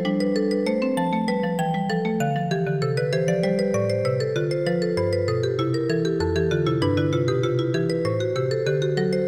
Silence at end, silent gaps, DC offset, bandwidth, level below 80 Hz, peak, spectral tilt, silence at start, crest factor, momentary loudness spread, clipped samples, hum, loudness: 0 s; none; 0.1%; 15.5 kHz; -52 dBFS; -10 dBFS; -7 dB/octave; 0 s; 12 dB; 2 LU; under 0.1%; none; -23 LUFS